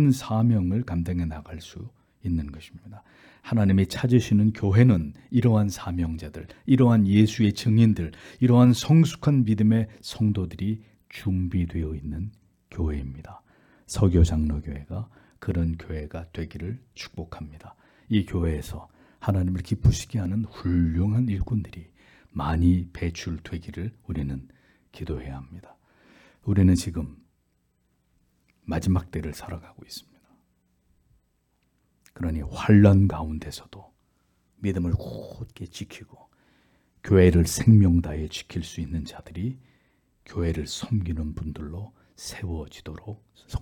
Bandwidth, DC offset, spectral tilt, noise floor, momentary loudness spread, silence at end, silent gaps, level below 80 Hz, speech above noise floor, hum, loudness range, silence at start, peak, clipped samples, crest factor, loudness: 15.5 kHz; under 0.1%; -7.5 dB/octave; -70 dBFS; 21 LU; 0 s; none; -42 dBFS; 47 dB; none; 12 LU; 0 s; -4 dBFS; under 0.1%; 20 dB; -24 LUFS